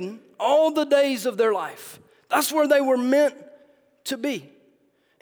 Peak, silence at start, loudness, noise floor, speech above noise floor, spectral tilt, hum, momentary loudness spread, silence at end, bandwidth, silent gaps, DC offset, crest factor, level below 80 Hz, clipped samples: -6 dBFS; 0 s; -22 LUFS; -64 dBFS; 43 dB; -3 dB/octave; none; 15 LU; 0.75 s; over 20 kHz; none; under 0.1%; 16 dB; -80 dBFS; under 0.1%